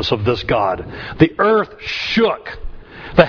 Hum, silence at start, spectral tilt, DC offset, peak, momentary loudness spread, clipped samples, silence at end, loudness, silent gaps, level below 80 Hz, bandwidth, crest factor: none; 0 s; -6.5 dB/octave; under 0.1%; 0 dBFS; 18 LU; under 0.1%; 0 s; -17 LUFS; none; -36 dBFS; 5.4 kHz; 18 dB